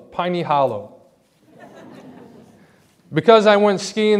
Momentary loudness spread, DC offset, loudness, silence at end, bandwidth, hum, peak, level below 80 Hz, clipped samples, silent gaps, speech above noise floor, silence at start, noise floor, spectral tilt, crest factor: 12 LU; under 0.1%; -16 LUFS; 0 s; 11 kHz; none; 0 dBFS; -66 dBFS; under 0.1%; none; 39 dB; 0.15 s; -55 dBFS; -5 dB/octave; 20 dB